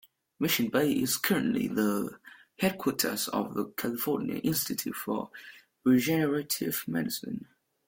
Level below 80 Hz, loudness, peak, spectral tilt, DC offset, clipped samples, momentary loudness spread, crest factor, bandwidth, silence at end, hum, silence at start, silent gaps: -66 dBFS; -29 LUFS; -10 dBFS; -4 dB/octave; under 0.1%; under 0.1%; 9 LU; 20 dB; 17 kHz; 0.45 s; none; 0.4 s; none